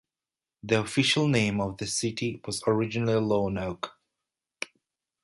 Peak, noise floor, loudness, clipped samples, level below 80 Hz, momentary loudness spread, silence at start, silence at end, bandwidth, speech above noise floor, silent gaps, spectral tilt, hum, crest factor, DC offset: -8 dBFS; under -90 dBFS; -27 LUFS; under 0.1%; -56 dBFS; 16 LU; 0.65 s; 0.6 s; 11.5 kHz; over 63 dB; none; -4.5 dB/octave; none; 20 dB; under 0.1%